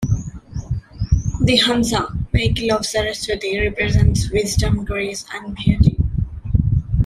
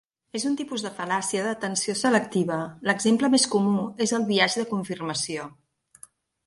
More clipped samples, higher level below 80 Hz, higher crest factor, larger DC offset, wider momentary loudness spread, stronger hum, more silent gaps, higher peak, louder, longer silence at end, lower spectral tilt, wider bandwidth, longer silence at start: neither; first, -26 dBFS vs -68 dBFS; about the same, 16 dB vs 18 dB; neither; about the same, 11 LU vs 10 LU; neither; neither; first, -2 dBFS vs -8 dBFS; first, -19 LUFS vs -25 LUFS; second, 0 s vs 0.95 s; first, -5 dB/octave vs -3.5 dB/octave; first, 14.5 kHz vs 11.5 kHz; second, 0 s vs 0.35 s